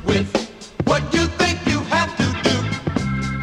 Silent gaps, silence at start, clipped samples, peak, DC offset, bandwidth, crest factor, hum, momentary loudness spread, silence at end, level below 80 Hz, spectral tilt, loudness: none; 0 s; under 0.1%; -4 dBFS; under 0.1%; 13.5 kHz; 18 dB; none; 6 LU; 0 s; -36 dBFS; -5 dB/octave; -20 LUFS